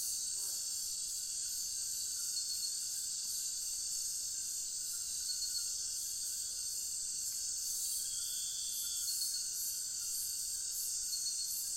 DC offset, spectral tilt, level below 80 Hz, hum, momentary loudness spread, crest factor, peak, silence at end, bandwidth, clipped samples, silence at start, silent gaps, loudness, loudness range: under 0.1%; 3 dB/octave; -68 dBFS; none; 2 LU; 14 dB; -24 dBFS; 0 s; 16 kHz; under 0.1%; 0 s; none; -36 LUFS; 1 LU